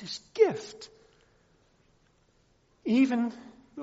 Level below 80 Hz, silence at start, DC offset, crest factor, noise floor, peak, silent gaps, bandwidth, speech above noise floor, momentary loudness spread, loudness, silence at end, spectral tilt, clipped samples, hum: -72 dBFS; 0 s; under 0.1%; 22 dB; -67 dBFS; -10 dBFS; none; 8 kHz; 38 dB; 23 LU; -28 LUFS; 0 s; -4.5 dB/octave; under 0.1%; none